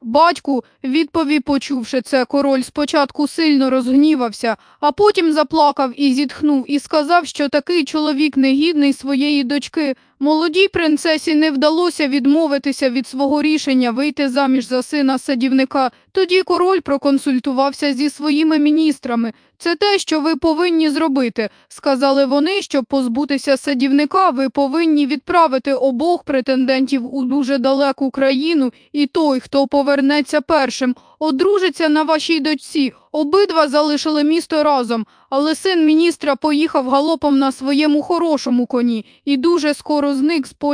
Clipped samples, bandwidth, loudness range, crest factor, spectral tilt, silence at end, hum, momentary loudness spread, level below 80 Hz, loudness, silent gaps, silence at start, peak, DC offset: under 0.1%; 10.5 kHz; 1 LU; 14 dB; -3.5 dB/octave; 0 s; none; 6 LU; -56 dBFS; -16 LUFS; none; 0 s; -2 dBFS; under 0.1%